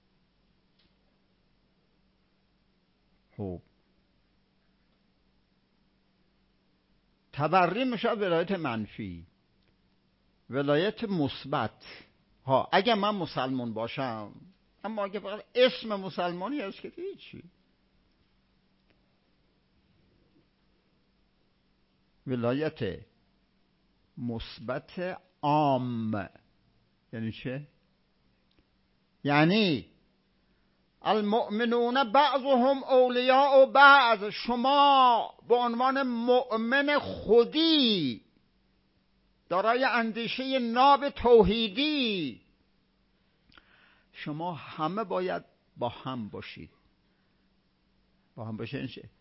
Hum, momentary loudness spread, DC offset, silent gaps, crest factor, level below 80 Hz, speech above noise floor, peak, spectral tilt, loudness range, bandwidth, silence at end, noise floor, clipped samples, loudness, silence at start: none; 18 LU; under 0.1%; none; 24 dB; -58 dBFS; 44 dB; -6 dBFS; -9 dB/octave; 20 LU; 5.8 kHz; 0.15 s; -70 dBFS; under 0.1%; -26 LUFS; 3.4 s